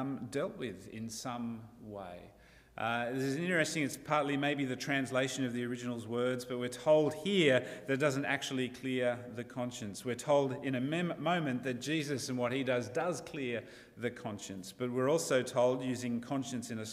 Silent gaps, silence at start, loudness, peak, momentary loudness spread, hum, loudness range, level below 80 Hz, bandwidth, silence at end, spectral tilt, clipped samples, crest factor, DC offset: none; 0 s; -34 LUFS; -14 dBFS; 13 LU; none; 5 LU; -70 dBFS; 15.5 kHz; 0 s; -5 dB/octave; under 0.1%; 20 dB; under 0.1%